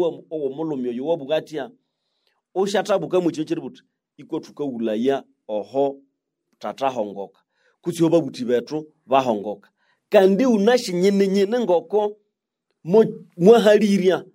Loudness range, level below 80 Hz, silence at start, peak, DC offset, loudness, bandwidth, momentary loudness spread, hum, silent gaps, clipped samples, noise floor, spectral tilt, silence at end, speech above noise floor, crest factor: 8 LU; -74 dBFS; 0 s; -2 dBFS; under 0.1%; -20 LUFS; 16 kHz; 16 LU; none; none; under 0.1%; -78 dBFS; -6 dB/octave; 0.1 s; 58 dB; 20 dB